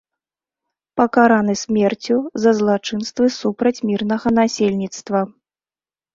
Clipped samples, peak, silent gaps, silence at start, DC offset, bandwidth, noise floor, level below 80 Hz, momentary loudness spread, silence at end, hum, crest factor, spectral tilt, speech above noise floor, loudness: under 0.1%; -2 dBFS; none; 0.95 s; under 0.1%; 7.6 kHz; under -90 dBFS; -56 dBFS; 8 LU; 0.85 s; none; 16 dB; -5.5 dB/octave; over 73 dB; -18 LUFS